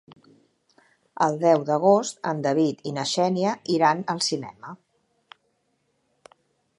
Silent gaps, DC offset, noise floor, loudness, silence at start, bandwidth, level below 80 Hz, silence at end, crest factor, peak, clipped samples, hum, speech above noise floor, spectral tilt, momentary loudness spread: none; under 0.1%; -71 dBFS; -23 LUFS; 1.15 s; 11.5 kHz; -74 dBFS; 2.05 s; 20 dB; -6 dBFS; under 0.1%; none; 49 dB; -4.5 dB/octave; 10 LU